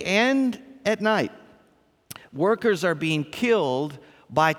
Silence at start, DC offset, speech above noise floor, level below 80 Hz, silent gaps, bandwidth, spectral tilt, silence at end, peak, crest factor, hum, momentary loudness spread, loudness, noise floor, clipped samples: 0 s; under 0.1%; 39 dB; -66 dBFS; none; 17.5 kHz; -5 dB/octave; 0 s; -6 dBFS; 18 dB; none; 12 LU; -24 LUFS; -61 dBFS; under 0.1%